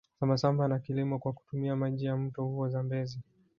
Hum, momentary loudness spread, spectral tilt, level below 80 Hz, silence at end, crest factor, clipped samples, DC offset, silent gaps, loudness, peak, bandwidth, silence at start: none; 8 LU; -8.5 dB/octave; -66 dBFS; 0.35 s; 20 dB; under 0.1%; under 0.1%; none; -32 LUFS; -12 dBFS; 7 kHz; 0.2 s